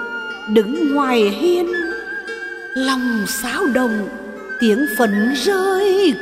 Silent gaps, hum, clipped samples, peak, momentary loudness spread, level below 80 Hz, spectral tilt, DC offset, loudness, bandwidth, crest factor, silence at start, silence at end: none; none; under 0.1%; -2 dBFS; 11 LU; -54 dBFS; -4 dB/octave; under 0.1%; -18 LUFS; 16 kHz; 14 dB; 0 s; 0 s